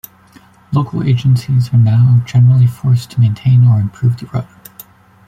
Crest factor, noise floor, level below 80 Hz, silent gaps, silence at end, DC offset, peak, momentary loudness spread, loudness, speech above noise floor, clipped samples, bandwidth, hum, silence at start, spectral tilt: 10 dB; -44 dBFS; -46 dBFS; none; 0.85 s; under 0.1%; -2 dBFS; 9 LU; -12 LUFS; 33 dB; under 0.1%; 15 kHz; none; 0.7 s; -8.5 dB/octave